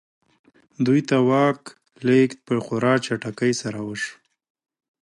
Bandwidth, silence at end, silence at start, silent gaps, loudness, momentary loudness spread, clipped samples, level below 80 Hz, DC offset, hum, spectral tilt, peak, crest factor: 11.5 kHz; 1 s; 0.8 s; none; -22 LUFS; 11 LU; under 0.1%; -66 dBFS; under 0.1%; none; -6 dB/octave; -6 dBFS; 16 dB